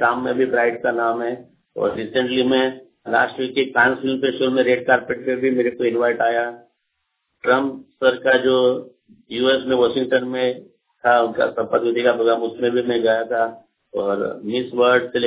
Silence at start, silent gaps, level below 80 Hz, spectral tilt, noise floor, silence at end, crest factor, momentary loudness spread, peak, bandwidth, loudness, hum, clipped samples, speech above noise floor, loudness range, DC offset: 0 s; none; -62 dBFS; -8.5 dB/octave; -74 dBFS; 0 s; 18 dB; 9 LU; -2 dBFS; 4 kHz; -19 LUFS; none; under 0.1%; 55 dB; 2 LU; under 0.1%